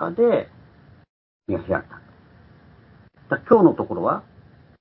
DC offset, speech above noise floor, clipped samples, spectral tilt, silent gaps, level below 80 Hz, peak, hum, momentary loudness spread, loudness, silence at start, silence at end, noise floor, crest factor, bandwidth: under 0.1%; 31 dB; under 0.1%; -12 dB/octave; 1.09-1.40 s; -52 dBFS; 0 dBFS; none; 14 LU; -21 LUFS; 0 s; 0.6 s; -51 dBFS; 22 dB; 4.3 kHz